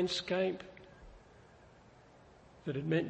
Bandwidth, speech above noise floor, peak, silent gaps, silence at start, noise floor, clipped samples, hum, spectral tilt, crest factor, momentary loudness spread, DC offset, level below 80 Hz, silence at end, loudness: 8.4 kHz; 26 dB; -20 dBFS; none; 0 s; -60 dBFS; under 0.1%; none; -5.5 dB/octave; 18 dB; 27 LU; under 0.1%; -64 dBFS; 0 s; -36 LUFS